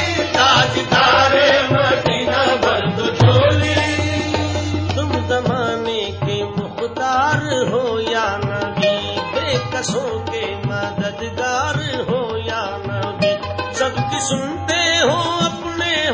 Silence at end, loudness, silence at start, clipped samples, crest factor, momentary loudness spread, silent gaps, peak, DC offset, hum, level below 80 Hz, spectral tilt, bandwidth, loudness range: 0 s; -17 LUFS; 0 s; under 0.1%; 16 dB; 10 LU; none; 0 dBFS; under 0.1%; none; -36 dBFS; -4.5 dB/octave; 8 kHz; 7 LU